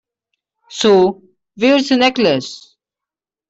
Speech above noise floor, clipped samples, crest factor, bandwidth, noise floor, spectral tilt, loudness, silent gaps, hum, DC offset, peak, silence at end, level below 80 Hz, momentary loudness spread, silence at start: 74 dB; under 0.1%; 14 dB; 8.2 kHz; -87 dBFS; -4.5 dB/octave; -14 LUFS; none; none; under 0.1%; -2 dBFS; 0.9 s; -58 dBFS; 19 LU; 0.7 s